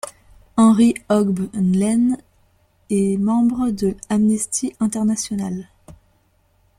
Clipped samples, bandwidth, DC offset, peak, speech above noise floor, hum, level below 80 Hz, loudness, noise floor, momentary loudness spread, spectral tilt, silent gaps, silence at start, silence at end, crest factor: under 0.1%; 14 kHz; under 0.1%; -4 dBFS; 43 dB; none; -50 dBFS; -19 LUFS; -60 dBFS; 10 LU; -6 dB/octave; none; 0.05 s; 0.85 s; 16 dB